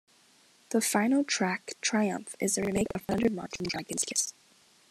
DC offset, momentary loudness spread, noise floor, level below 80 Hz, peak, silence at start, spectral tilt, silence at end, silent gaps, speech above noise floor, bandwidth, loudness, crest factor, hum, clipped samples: under 0.1%; 7 LU; -62 dBFS; -62 dBFS; -12 dBFS; 0.7 s; -3.5 dB/octave; 0.6 s; none; 33 dB; 14.5 kHz; -29 LUFS; 20 dB; none; under 0.1%